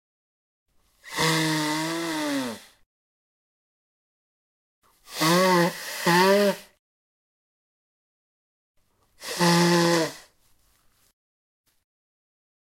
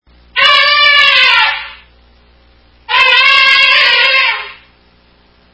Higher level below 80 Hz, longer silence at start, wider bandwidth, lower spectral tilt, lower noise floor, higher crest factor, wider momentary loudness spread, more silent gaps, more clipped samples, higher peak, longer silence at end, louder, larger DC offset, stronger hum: second, -70 dBFS vs -48 dBFS; first, 1.05 s vs 0.35 s; first, 16.5 kHz vs 8 kHz; first, -4 dB/octave vs 0.5 dB/octave; first, -63 dBFS vs -48 dBFS; first, 20 dB vs 12 dB; about the same, 15 LU vs 14 LU; first, 2.86-4.82 s, 6.79-8.75 s vs none; second, under 0.1% vs 0.5%; second, -8 dBFS vs 0 dBFS; first, 2.4 s vs 1 s; second, -23 LUFS vs -6 LUFS; neither; neither